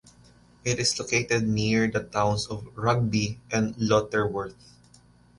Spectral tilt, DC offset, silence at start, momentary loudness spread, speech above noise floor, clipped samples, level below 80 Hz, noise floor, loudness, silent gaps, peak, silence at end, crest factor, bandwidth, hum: -4.5 dB/octave; under 0.1%; 0.65 s; 7 LU; 31 dB; under 0.1%; -52 dBFS; -56 dBFS; -26 LUFS; none; -8 dBFS; 0.85 s; 20 dB; 11.5 kHz; 60 Hz at -45 dBFS